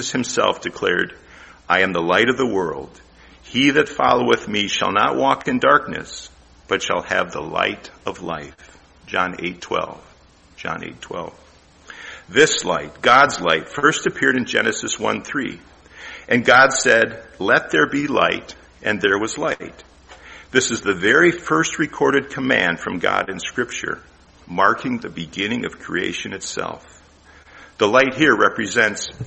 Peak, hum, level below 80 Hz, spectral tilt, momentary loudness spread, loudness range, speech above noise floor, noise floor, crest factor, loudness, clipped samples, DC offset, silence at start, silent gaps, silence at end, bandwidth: 0 dBFS; none; -52 dBFS; -3 dB/octave; 15 LU; 8 LU; 31 dB; -50 dBFS; 20 dB; -18 LUFS; under 0.1%; under 0.1%; 0 s; none; 0 s; 8.8 kHz